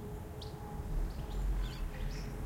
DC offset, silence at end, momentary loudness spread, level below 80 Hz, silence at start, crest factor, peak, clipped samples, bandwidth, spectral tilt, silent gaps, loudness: under 0.1%; 0 s; 6 LU; -40 dBFS; 0 s; 12 dB; -26 dBFS; under 0.1%; 16.5 kHz; -6 dB/octave; none; -42 LUFS